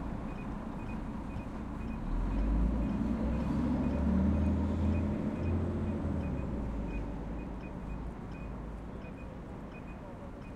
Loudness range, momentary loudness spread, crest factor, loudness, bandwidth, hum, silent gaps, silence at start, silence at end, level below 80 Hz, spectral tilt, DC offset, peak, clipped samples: 10 LU; 14 LU; 16 dB; -36 LUFS; 9 kHz; none; none; 0 s; 0 s; -40 dBFS; -9 dB/octave; under 0.1%; -18 dBFS; under 0.1%